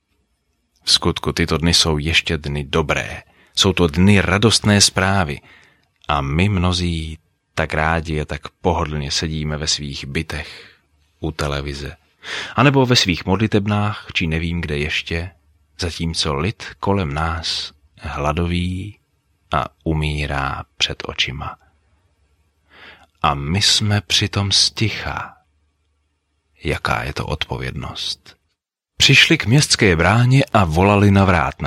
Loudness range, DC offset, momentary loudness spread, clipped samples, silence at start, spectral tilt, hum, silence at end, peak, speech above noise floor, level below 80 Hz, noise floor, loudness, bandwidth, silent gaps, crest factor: 8 LU; under 0.1%; 15 LU; under 0.1%; 0.85 s; -4 dB/octave; none; 0 s; 0 dBFS; 57 dB; -34 dBFS; -75 dBFS; -18 LUFS; 15.5 kHz; none; 20 dB